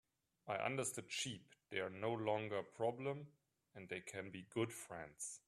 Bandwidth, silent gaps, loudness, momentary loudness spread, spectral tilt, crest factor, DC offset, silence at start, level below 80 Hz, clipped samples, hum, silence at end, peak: 14 kHz; none; -45 LUFS; 12 LU; -4 dB/octave; 20 dB; under 0.1%; 0.45 s; -82 dBFS; under 0.1%; none; 0.1 s; -24 dBFS